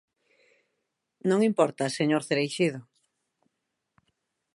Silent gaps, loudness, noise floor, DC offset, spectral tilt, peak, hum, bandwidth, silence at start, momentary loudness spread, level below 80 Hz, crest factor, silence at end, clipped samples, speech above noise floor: none; -26 LUFS; -82 dBFS; under 0.1%; -5.5 dB/octave; -8 dBFS; none; 11.5 kHz; 1.25 s; 6 LU; -80 dBFS; 22 dB; 1.75 s; under 0.1%; 57 dB